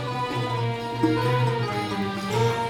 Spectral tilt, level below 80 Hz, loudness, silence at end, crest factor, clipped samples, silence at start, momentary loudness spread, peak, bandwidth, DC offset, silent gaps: -6.5 dB/octave; -54 dBFS; -25 LUFS; 0 s; 16 dB; under 0.1%; 0 s; 5 LU; -10 dBFS; 15.5 kHz; under 0.1%; none